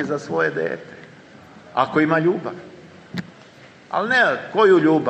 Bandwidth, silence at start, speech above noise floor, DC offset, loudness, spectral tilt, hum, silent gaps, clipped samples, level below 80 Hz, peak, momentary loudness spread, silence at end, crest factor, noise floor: 8.4 kHz; 0 s; 27 dB; under 0.1%; -19 LUFS; -6.5 dB/octave; none; none; under 0.1%; -66 dBFS; -2 dBFS; 18 LU; 0 s; 18 dB; -46 dBFS